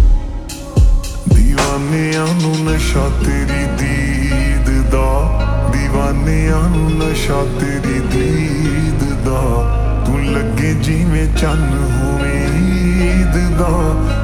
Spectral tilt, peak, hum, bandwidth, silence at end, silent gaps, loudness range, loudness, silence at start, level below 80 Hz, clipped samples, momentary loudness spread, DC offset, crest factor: -6 dB/octave; 0 dBFS; none; 13.5 kHz; 0 s; none; 1 LU; -15 LUFS; 0 s; -16 dBFS; under 0.1%; 3 LU; under 0.1%; 12 dB